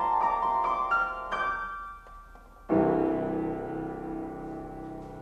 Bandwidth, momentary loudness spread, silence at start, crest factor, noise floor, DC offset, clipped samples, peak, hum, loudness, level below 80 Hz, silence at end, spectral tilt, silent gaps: 8.6 kHz; 15 LU; 0 s; 16 dB; -50 dBFS; under 0.1%; under 0.1%; -14 dBFS; none; -29 LUFS; -52 dBFS; 0 s; -7.5 dB/octave; none